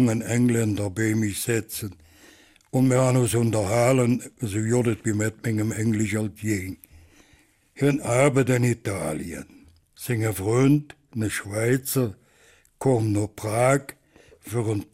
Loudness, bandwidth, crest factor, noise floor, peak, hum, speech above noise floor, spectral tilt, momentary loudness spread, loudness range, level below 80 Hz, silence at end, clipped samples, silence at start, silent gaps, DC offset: -24 LUFS; 16 kHz; 16 dB; -59 dBFS; -8 dBFS; none; 36 dB; -6 dB/octave; 10 LU; 3 LU; -56 dBFS; 0.1 s; under 0.1%; 0 s; none; under 0.1%